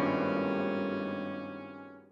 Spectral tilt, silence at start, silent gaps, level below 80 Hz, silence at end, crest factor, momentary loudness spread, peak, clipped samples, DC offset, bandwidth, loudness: -8 dB/octave; 0 s; none; -76 dBFS; 0.05 s; 16 dB; 15 LU; -18 dBFS; under 0.1%; under 0.1%; 7 kHz; -33 LUFS